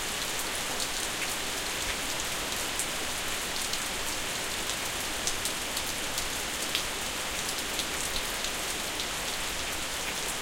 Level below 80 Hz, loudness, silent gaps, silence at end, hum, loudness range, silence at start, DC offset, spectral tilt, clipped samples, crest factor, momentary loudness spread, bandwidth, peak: -48 dBFS; -30 LUFS; none; 0 s; none; 0 LU; 0 s; under 0.1%; -0.5 dB/octave; under 0.1%; 28 dB; 1 LU; 17 kHz; -6 dBFS